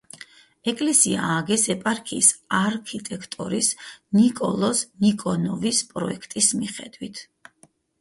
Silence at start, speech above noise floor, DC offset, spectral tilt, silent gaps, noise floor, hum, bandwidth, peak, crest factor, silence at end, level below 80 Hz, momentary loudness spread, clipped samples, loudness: 0.65 s; 36 dB; under 0.1%; -3 dB/octave; none; -59 dBFS; none; 11.5 kHz; -2 dBFS; 22 dB; 0.8 s; -62 dBFS; 17 LU; under 0.1%; -22 LUFS